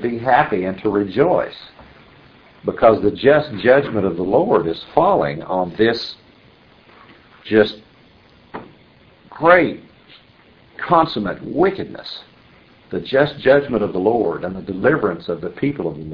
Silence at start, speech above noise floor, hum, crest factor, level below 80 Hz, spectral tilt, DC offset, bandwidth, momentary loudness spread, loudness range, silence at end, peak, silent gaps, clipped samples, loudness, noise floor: 0 s; 33 dB; none; 18 dB; -50 dBFS; -8 dB/octave; under 0.1%; 5.4 kHz; 16 LU; 6 LU; 0 s; 0 dBFS; none; under 0.1%; -17 LUFS; -50 dBFS